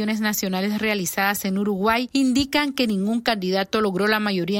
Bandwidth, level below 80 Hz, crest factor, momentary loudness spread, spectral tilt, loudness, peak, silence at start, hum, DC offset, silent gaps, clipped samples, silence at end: 16.5 kHz; -52 dBFS; 18 dB; 2 LU; -4 dB/octave; -22 LUFS; -4 dBFS; 0 s; none; under 0.1%; none; under 0.1%; 0 s